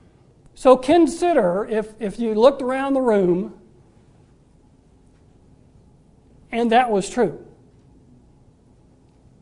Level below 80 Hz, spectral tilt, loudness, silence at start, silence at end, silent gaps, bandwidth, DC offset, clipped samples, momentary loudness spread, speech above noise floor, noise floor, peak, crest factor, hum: -52 dBFS; -6 dB/octave; -19 LUFS; 0.6 s; 1.95 s; none; 11 kHz; under 0.1%; under 0.1%; 10 LU; 36 dB; -54 dBFS; 0 dBFS; 22 dB; none